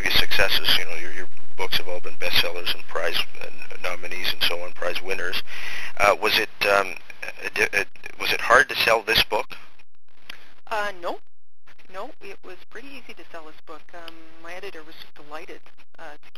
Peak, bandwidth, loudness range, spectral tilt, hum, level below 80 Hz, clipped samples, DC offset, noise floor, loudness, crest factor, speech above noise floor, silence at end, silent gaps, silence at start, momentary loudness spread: 0 dBFS; 15 kHz; 20 LU; -2 dB/octave; none; -48 dBFS; under 0.1%; under 0.1%; -47 dBFS; -23 LUFS; 20 dB; 26 dB; 0 s; none; 0 s; 24 LU